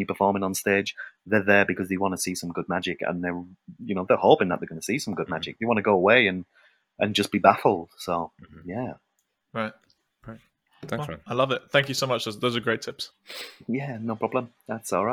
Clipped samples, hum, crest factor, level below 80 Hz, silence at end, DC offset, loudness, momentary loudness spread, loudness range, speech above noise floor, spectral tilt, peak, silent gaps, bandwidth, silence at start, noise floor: under 0.1%; none; 26 dB; -66 dBFS; 0 s; under 0.1%; -25 LUFS; 17 LU; 8 LU; 50 dB; -4.5 dB/octave; 0 dBFS; none; over 20 kHz; 0 s; -75 dBFS